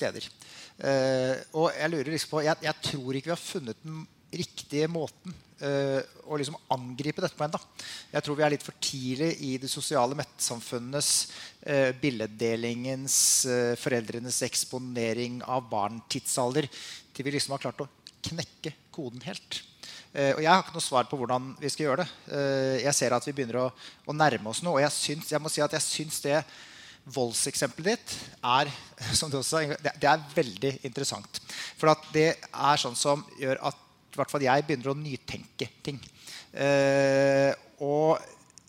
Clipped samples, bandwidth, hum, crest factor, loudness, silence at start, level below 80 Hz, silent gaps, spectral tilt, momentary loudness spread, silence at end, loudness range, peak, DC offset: under 0.1%; 16.5 kHz; none; 24 dB; -28 LUFS; 0 s; -66 dBFS; none; -3.5 dB/octave; 14 LU; 0.35 s; 6 LU; -6 dBFS; under 0.1%